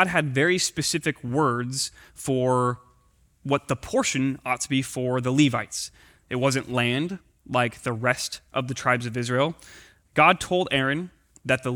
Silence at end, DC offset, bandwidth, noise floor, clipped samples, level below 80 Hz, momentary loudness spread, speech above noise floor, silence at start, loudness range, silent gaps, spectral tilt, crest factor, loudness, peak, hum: 0 s; under 0.1%; 20 kHz; -61 dBFS; under 0.1%; -56 dBFS; 11 LU; 37 dB; 0 s; 3 LU; none; -4.5 dB/octave; 22 dB; -24 LUFS; -4 dBFS; none